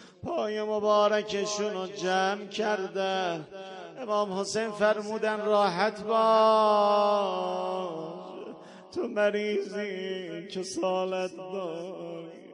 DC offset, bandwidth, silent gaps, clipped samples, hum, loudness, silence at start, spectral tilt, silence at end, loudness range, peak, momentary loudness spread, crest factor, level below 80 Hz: under 0.1%; 11 kHz; none; under 0.1%; none; -28 LUFS; 0 s; -4 dB/octave; 0 s; 7 LU; -12 dBFS; 17 LU; 18 dB; -74 dBFS